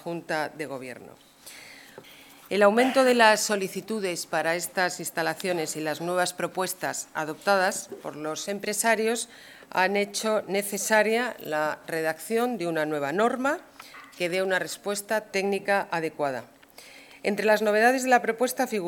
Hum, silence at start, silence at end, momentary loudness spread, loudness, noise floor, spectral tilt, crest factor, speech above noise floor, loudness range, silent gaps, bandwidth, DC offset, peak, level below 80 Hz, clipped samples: none; 0 s; 0 s; 14 LU; -26 LUFS; -50 dBFS; -3 dB/octave; 24 dB; 24 dB; 4 LU; none; 18 kHz; under 0.1%; -4 dBFS; -74 dBFS; under 0.1%